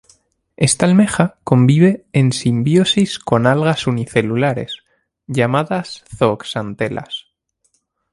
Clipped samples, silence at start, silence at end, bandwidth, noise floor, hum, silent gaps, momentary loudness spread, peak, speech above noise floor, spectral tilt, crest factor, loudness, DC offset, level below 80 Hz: under 0.1%; 0.6 s; 0.9 s; 11.5 kHz; -65 dBFS; none; none; 12 LU; 0 dBFS; 50 dB; -5.5 dB/octave; 16 dB; -16 LUFS; under 0.1%; -50 dBFS